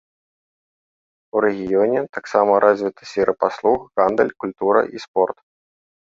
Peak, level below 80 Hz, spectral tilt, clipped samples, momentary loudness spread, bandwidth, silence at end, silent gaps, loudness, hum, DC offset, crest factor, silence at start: -2 dBFS; -58 dBFS; -6 dB/octave; under 0.1%; 8 LU; 7.6 kHz; 0.7 s; 2.09-2.13 s, 5.08-5.14 s; -19 LUFS; none; under 0.1%; 18 dB; 1.35 s